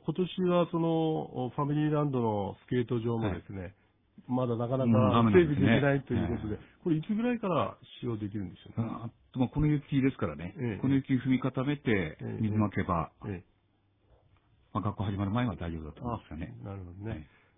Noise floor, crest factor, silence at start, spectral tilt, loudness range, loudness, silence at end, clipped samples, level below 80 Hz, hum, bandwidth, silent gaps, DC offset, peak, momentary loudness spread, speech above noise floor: -71 dBFS; 20 dB; 0.05 s; -11.5 dB/octave; 9 LU; -31 LUFS; 0.35 s; under 0.1%; -54 dBFS; none; 3.9 kHz; none; under 0.1%; -10 dBFS; 16 LU; 41 dB